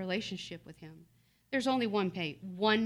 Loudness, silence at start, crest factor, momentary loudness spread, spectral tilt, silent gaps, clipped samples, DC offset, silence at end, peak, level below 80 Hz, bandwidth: -34 LUFS; 0 s; 18 dB; 20 LU; -5 dB/octave; none; under 0.1%; under 0.1%; 0 s; -16 dBFS; -70 dBFS; 13 kHz